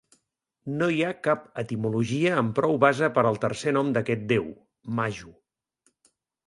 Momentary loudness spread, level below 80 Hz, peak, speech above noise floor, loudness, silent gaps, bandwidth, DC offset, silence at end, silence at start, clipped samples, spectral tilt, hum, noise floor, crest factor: 12 LU; -62 dBFS; -4 dBFS; 51 dB; -25 LUFS; none; 11.5 kHz; under 0.1%; 1.15 s; 0.65 s; under 0.1%; -6.5 dB/octave; none; -76 dBFS; 22 dB